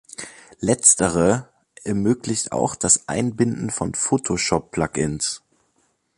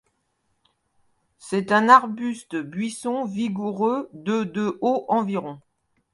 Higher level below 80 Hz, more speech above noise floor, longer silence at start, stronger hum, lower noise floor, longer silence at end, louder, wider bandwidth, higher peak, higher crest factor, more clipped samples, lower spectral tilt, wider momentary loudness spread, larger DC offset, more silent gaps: first, -48 dBFS vs -70 dBFS; about the same, 46 dB vs 49 dB; second, 0.2 s vs 1.45 s; neither; second, -66 dBFS vs -72 dBFS; first, 0.8 s vs 0.55 s; first, -20 LUFS vs -23 LUFS; about the same, 11.5 kHz vs 11.5 kHz; about the same, 0 dBFS vs 0 dBFS; about the same, 22 dB vs 24 dB; neither; second, -4 dB/octave vs -5.5 dB/octave; about the same, 12 LU vs 14 LU; neither; neither